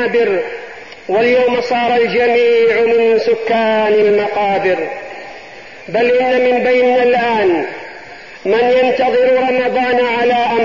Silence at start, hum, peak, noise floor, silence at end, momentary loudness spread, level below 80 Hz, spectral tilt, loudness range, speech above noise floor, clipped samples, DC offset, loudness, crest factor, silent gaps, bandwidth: 0 s; none; -4 dBFS; -34 dBFS; 0 s; 17 LU; -54 dBFS; -5.5 dB/octave; 2 LU; 21 dB; under 0.1%; 0.6%; -13 LUFS; 10 dB; none; 7.2 kHz